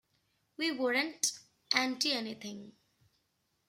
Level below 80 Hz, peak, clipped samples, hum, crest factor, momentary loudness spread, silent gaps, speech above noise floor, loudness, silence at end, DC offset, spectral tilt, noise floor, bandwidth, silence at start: -84 dBFS; -12 dBFS; under 0.1%; none; 26 dB; 15 LU; none; 45 dB; -32 LUFS; 1 s; under 0.1%; -1 dB/octave; -79 dBFS; 16 kHz; 0.6 s